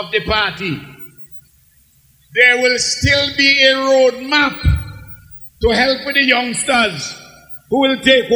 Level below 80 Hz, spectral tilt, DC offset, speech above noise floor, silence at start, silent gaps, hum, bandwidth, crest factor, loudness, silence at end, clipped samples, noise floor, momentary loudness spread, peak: -32 dBFS; -3.5 dB/octave; under 0.1%; 38 dB; 0 s; none; none; over 20 kHz; 16 dB; -13 LUFS; 0 s; under 0.1%; -52 dBFS; 23 LU; 0 dBFS